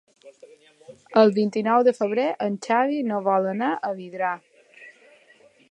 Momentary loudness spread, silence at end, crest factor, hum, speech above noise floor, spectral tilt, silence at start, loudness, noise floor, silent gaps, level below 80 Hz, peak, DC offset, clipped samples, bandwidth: 9 LU; 0.8 s; 22 dB; none; 34 dB; -6.5 dB/octave; 0.25 s; -22 LUFS; -56 dBFS; none; -80 dBFS; -2 dBFS; under 0.1%; under 0.1%; 9.6 kHz